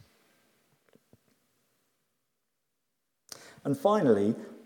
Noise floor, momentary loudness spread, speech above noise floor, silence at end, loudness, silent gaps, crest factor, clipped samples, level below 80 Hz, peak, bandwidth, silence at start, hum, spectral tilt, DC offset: -83 dBFS; 24 LU; 57 dB; 0.1 s; -27 LUFS; none; 22 dB; under 0.1%; -84 dBFS; -10 dBFS; 18.5 kHz; 3.65 s; none; -7 dB/octave; under 0.1%